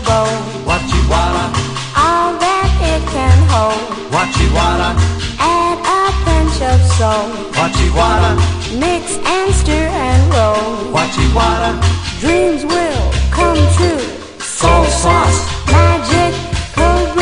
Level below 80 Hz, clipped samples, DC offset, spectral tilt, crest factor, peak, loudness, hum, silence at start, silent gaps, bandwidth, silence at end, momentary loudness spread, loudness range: -20 dBFS; under 0.1%; 0.3%; -5 dB/octave; 12 dB; 0 dBFS; -13 LUFS; none; 0 s; none; 10.5 kHz; 0 s; 6 LU; 1 LU